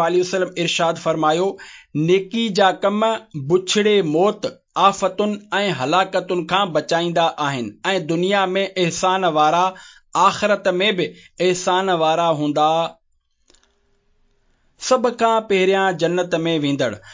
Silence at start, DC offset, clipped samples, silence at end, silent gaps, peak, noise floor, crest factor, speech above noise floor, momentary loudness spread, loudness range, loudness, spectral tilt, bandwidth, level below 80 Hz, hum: 0 s; under 0.1%; under 0.1%; 0 s; none; -2 dBFS; -64 dBFS; 16 dB; 46 dB; 7 LU; 3 LU; -19 LUFS; -4.5 dB/octave; 7.8 kHz; -62 dBFS; none